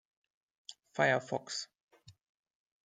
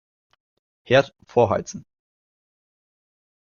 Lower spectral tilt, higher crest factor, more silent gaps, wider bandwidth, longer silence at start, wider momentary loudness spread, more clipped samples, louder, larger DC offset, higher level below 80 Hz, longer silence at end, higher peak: second, -3.5 dB/octave vs -5.5 dB/octave; about the same, 24 dB vs 22 dB; first, 1.81-1.88 s vs none; first, 9.6 kHz vs 7.2 kHz; second, 0.7 s vs 0.9 s; first, 22 LU vs 16 LU; neither; second, -34 LUFS vs -21 LUFS; neither; second, -84 dBFS vs -60 dBFS; second, 0.75 s vs 1.65 s; second, -14 dBFS vs -4 dBFS